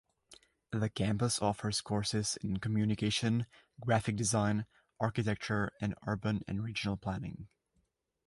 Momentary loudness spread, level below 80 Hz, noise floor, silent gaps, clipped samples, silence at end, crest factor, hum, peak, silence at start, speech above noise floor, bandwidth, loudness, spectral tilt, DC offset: 8 LU; -58 dBFS; -78 dBFS; none; under 0.1%; 0.8 s; 20 dB; none; -14 dBFS; 0.3 s; 44 dB; 11.5 kHz; -34 LUFS; -5 dB/octave; under 0.1%